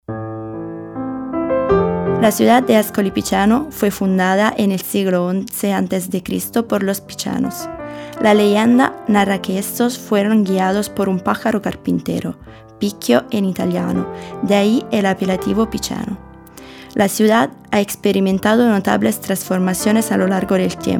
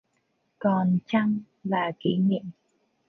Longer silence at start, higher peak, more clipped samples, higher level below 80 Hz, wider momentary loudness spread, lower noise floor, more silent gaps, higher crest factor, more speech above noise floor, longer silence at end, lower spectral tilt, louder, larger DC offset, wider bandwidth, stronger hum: second, 0.1 s vs 0.6 s; first, 0 dBFS vs -10 dBFS; neither; first, -46 dBFS vs -68 dBFS; first, 12 LU vs 7 LU; second, -38 dBFS vs -73 dBFS; neither; about the same, 16 dB vs 16 dB; second, 22 dB vs 48 dB; second, 0 s vs 0.55 s; second, -5.5 dB/octave vs -9 dB/octave; first, -17 LUFS vs -26 LUFS; neither; first, 18.5 kHz vs 4.6 kHz; neither